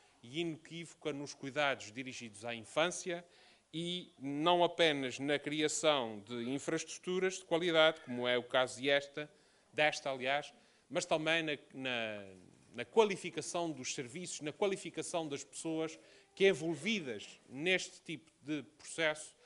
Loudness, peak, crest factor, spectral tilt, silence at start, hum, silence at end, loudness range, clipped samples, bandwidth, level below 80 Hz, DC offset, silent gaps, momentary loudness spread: -36 LUFS; -14 dBFS; 24 dB; -3.5 dB/octave; 0.25 s; none; 0.15 s; 5 LU; under 0.1%; 11.5 kHz; -82 dBFS; under 0.1%; none; 14 LU